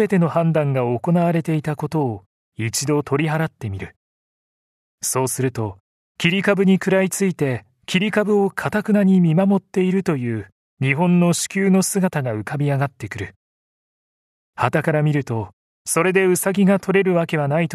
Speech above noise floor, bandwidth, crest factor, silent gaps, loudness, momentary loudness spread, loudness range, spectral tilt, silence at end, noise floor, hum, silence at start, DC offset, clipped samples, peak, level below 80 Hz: over 71 dB; 14 kHz; 18 dB; 2.26-2.52 s, 3.96-4.98 s, 5.80-6.15 s, 10.52-10.77 s, 13.36-14.53 s, 15.53-15.85 s; -19 LUFS; 12 LU; 6 LU; -5.5 dB/octave; 0 s; under -90 dBFS; none; 0 s; under 0.1%; under 0.1%; 0 dBFS; -58 dBFS